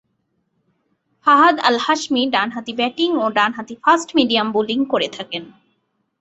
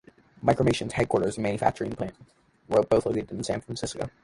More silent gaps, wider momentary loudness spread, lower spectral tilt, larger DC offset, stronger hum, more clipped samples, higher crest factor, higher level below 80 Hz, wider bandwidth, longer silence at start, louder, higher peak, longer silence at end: neither; about the same, 10 LU vs 10 LU; second, -3 dB/octave vs -6 dB/octave; neither; neither; neither; about the same, 18 dB vs 20 dB; second, -64 dBFS vs -50 dBFS; second, 8.2 kHz vs 11.5 kHz; first, 1.25 s vs 0.4 s; first, -17 LUFS vs -27 LUFS; first, -2 dBFS vs -6 dBFS; first, 0.7 s vs 0.15 s